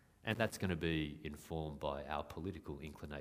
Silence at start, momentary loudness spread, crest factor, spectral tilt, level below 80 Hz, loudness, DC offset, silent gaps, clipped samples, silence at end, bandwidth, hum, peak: 0.25 s; 11 LU; 24 dB; -5.5 dB/octave; -56 dBFS; -42 LUFS; under 0.1%; none; under 0.1%; 0 s; 15.5 kHz; none; -18 dBFS